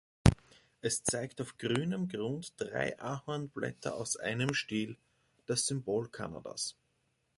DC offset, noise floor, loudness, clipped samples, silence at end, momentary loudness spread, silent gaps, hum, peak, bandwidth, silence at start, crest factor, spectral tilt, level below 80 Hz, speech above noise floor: under 0.1%; -77 dBFS; -35 LUFS; under 0.1%; 0.65 s; 9 LU; none; none; -6 dBFS; 11.5 kHz; 0.25 s; 30 dB; -4.5 dB/octave; -48 dBFS; 41 dB